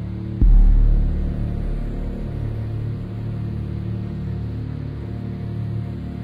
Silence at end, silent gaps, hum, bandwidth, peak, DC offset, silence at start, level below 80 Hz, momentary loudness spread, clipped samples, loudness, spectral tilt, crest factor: 0 s; none; none; 4.4 kHz; -6 dBFS; under 0.1%; 0 s; -22 dBFS; 10 LU; under 0.1%; -25 LUFS; -10 dB/octave; 14 dB